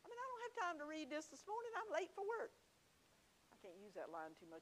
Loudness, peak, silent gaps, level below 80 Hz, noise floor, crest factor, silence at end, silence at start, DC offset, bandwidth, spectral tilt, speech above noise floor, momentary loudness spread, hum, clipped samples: -49 LUFS; -30 dBFS; none; -88 dBFS; -75 dBFS; 20 dB; 0 s; 0.05 s; under 0.1%; 15.5 kHz; -3 dB/octave; 25 dB; 11 LU; none; under 0.1%